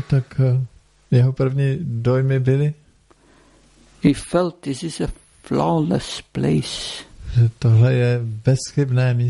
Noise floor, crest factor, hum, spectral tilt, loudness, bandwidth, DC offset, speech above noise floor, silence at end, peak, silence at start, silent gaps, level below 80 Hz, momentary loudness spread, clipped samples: -54 dBFS; 18 dB; none; -7 dB/octave; -20 LUFS; 11.5 kHz; under 0.1%; 36 dB; 0 s; -2 dBFS; 0 s; none; -42 dBFS; 11 LU; under 0.1%